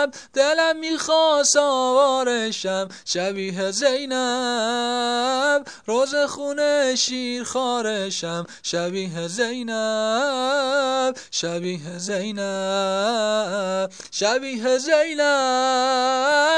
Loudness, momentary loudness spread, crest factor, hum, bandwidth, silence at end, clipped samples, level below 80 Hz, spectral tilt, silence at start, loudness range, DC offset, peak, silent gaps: -21 LUFS; 8 LU; 18 dB; none; 10.5 kHz; 0 s; under 0.1%; -72 dBFS; -2.5 dB/octave; 0 s; 4 LU; 0.1%; -4 dBFS; none